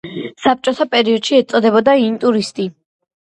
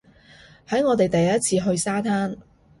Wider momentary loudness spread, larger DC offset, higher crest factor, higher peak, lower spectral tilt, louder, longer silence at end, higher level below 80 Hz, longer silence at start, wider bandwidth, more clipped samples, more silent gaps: first, 11 LU vs 7 LU; neither; about the same, 14 dB vs 16 dB; first, 0 dBFS vs -8 dBFS; about the same, -4.5 dB/octave vs -5 dB/octave; first, -15 LUFS vs -22 LUFS; about the same, 0.5 s vs 0.4 s; second, -60 dBFS vs -54 dBFS; second, 0.05 s vs 0.7 s; about the same, 10.5 kHz vs 11.5 kHz; neither; neither